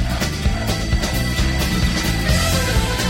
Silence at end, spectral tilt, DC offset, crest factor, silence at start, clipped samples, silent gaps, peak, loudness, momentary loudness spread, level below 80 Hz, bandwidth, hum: 0 s; -4.5 dB/octave; under 0.1%; 14 dB; 0 s; under 0.1%; none; -4 dBFS; -19 LUFS; 4 LU; -22 dBFS; 16.5 kHz; none